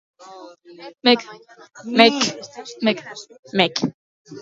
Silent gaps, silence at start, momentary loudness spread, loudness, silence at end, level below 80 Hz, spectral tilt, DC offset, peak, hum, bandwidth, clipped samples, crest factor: 3.39-3.43 s, 3.94-4.25 s; 0.3 s; 26 LU; -19 LUFS; 0 s; -70 dBFS; -3.5 dB/octave; under 0.1%; 0 dBFS; none; 7.8 kHz; under 0.1%; 22 dB